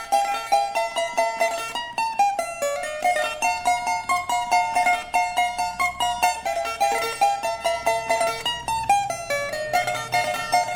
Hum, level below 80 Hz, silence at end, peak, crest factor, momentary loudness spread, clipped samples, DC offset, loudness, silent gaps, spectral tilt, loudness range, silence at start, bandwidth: none; -52 dBFS; 0 s; -6 dBFS; 18 dB; 5 LU; under 0.1%; under 0.1%; -23 LUFS; none; -1 dB/octave; 1 LU; 0 s; 19 kHz